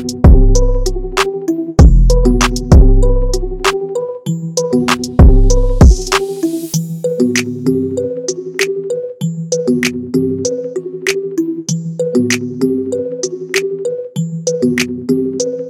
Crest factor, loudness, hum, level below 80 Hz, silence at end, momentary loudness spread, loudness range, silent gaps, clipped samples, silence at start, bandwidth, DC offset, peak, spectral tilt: 12 dB; -14 LUFS; none; -14 dBFS; 0 s; 11 LU; 5 LU; none; under 0.1%; 0 s; 15 kHz; under 0.1%; 0 dBFS; -5.5 dB/octave